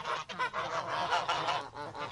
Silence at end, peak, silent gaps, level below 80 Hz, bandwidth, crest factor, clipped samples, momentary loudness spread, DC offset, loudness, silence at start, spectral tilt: 0 s; -18 dBFS; none; -66 dBFS; 11.5 kHz; 18 dB; under 0.1%; 7 LU; under 0.1%; -34 LUFS; 0 s; -2.5 dB/octave